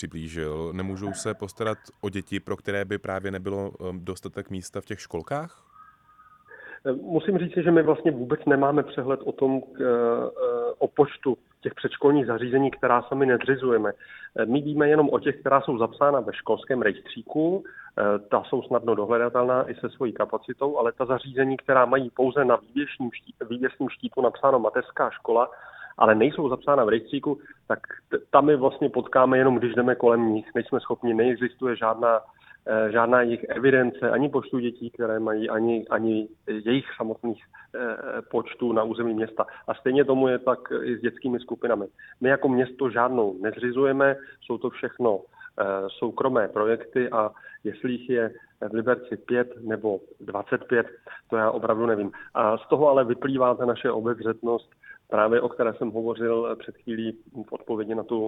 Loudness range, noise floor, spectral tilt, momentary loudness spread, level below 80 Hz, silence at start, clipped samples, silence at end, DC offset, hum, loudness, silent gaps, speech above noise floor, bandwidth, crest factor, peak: 6 LU; -56 dBFS; -7 dB/octave; 12 LU; -62 dBFS; 0 s; under 0.1%; 0 s; under 0.1%; none; -25 LUFS; none; 31 dB; 11 kHz; 24 dB; 0 dBFS